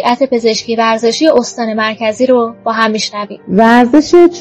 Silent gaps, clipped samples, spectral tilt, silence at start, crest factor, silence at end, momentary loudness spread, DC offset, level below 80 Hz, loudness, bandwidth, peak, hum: none; 2%; -4.5 dB/octave; 0 s; 10 dB; 0 s; 8 LU; under 0.1%; -50 dBFS; -11 LUFS; 9.2 kHz; 0 dBFS; none